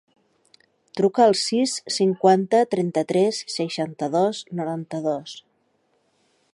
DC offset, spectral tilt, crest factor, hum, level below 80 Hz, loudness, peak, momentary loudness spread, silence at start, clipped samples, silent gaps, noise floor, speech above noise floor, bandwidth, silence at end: under 0.1%; -5 dB/octave; 18 dB; none; -74 dBFS; -22 LUFS; -4 dBFS; 11 LU; 0.95 s; under 0.1%; none; -67 dBFS; 46 dB; 11.5 kHz; 1.15 s